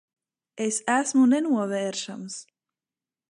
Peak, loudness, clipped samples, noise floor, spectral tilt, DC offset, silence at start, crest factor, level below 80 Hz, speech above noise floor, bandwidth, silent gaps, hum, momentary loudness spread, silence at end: -8 dBFS; -24 LUFS; under 0.1%; under -90 dBFS; -3.5 dB/octave; under 0.1%; 0.55 s; 18 dB; -82 dBFS; over 66 dB; 11.5 kHz; none; none; 16 LU; 0.85 s